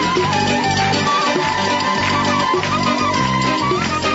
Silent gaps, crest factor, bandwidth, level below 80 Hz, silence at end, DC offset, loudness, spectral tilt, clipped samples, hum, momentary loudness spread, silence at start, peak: none; 12 dB; 8 kHz; -44 dBFS; 0 s; under 0.1%; -16 LUFS; -4 dB/octave; under 0.1%; none; 1 LU; 0 s; -4 dBFS